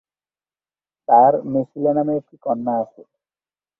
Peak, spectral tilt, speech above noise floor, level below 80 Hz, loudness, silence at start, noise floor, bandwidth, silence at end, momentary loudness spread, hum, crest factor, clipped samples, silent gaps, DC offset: -2 dBFS; -12 dB/octave; over 72 dB; -66 dBFS; -19 LUFS; 1.1 s; under -90 dBFS; 2.3 kHz; 0.95 s; 12 LU; 50 Hz at -50 dBFS; 18 dB; under 0.1%; none; under 0.1%